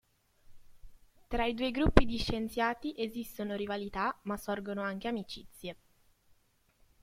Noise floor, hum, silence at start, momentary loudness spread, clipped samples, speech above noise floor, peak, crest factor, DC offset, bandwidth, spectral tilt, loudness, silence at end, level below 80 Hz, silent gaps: -70 dBFS; none; 0.5 s; 13 LU; under 0.1%; 38 dB; -2 dBFS; 32 dB; under 0.1%; 16 kHz; -6 dB/octave; -34 LUFS; 1.3 s; -42 dBFS; none